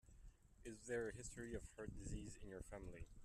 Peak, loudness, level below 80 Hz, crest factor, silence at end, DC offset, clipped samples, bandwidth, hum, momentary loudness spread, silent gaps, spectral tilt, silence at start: -34 dBFS; -53 LUFS; -60 dBFS; 18 dB; 0 s; under 0.1%; under 0.1%; 13.5 kHz; none; 12 LU; none; -5 dB/octave; 0.05 s